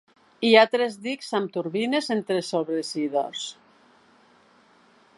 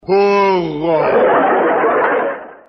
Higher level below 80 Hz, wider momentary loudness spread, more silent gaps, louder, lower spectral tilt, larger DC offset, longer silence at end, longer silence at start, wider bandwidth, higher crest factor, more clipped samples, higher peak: second, -78 dBFS vs -52 dBFS; first, 13 LU vs 5 LU; neither; second, -24 LUFS vs -14 LUFS; second, -4 dB/octave vs -7 dB/octave; neither; first, 1.65 s vs 0.15 s; first, 0.4 s vs 0.1 s; first, 11.5 kHz vs 6.2 kHz; first, 24 dB vs 12 dB; neither; about the same, -2 dBFS vs -2 dBFS